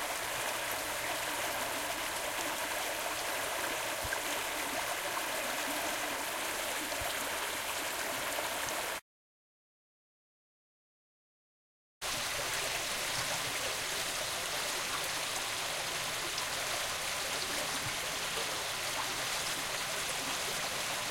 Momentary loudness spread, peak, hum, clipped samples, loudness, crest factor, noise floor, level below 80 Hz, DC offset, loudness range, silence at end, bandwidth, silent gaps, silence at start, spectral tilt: 2 LU; -20 dBFS; none; under 0.1%; -34 LUFS; 18 dB; under -90 dBFS; -62 dBFS; under 0.1%; 5 LU; 0 s; 16.5 kHz; 9.02-12.01 s; 0 s; -0.5 dB/octave